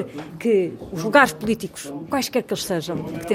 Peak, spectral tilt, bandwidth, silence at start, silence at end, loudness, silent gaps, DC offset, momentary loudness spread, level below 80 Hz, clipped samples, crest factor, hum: -2 dBFS; -4.5 dB/octave; 17 kHz; 0 s; 0 s; -22 LUFS; none; under 0.1%; 13 LU; -54 dBFS; under 0.1%; 20 dB; none